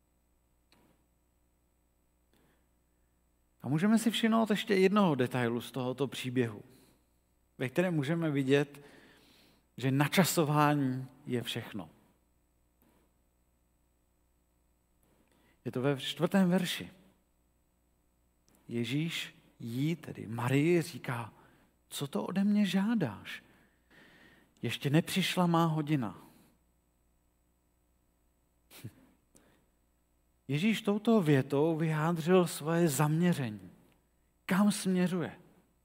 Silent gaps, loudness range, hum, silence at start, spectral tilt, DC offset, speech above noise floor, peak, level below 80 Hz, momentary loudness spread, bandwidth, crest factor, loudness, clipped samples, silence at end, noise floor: none; 9 LU; 60 Hz at -60 dBFS; 3.65 s; -6 dB/octave; under 0.1%; 43 dB; -10 dBFS; -74 dBFS; 14 LU; 16 kHz; 22 dB; -31 LUFS; under 0.1%; 0.5 s; -73 dBFS